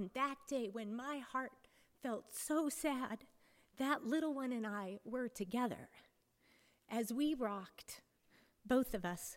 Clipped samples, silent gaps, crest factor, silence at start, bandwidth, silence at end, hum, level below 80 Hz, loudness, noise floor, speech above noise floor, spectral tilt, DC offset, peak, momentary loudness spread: under 0.1%; none; 20 dB; 0 s; 17 kHz; 0 s; none; -68 dBFS; -41 LUFS; -74 dBFS; 33 dB; -4 dB/octave; under 0.1%; -22 dBFS; 13 LU